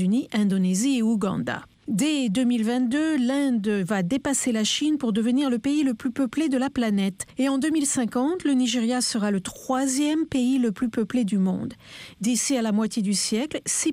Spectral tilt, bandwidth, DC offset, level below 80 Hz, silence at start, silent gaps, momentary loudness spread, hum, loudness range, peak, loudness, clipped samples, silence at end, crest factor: -4.5 dB/octave; 15.5 kHz; under 0.1%; -60 dBFS; 0 s; none; 4 LU; none; 1 LU; -12 dBFS; -24 LUFS; under 0.1%; 0 s; 12 dB